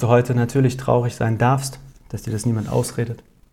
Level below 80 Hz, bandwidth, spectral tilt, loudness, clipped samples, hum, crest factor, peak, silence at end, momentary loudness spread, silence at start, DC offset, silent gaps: -46 dBFS; 14.5 kHz; -6.5 dB/octave; -21 LUFS; under 0.1%; none; 18 dB; -2 dBFS; 0.35 s; 13 LU; 0 s; under 0.1%; none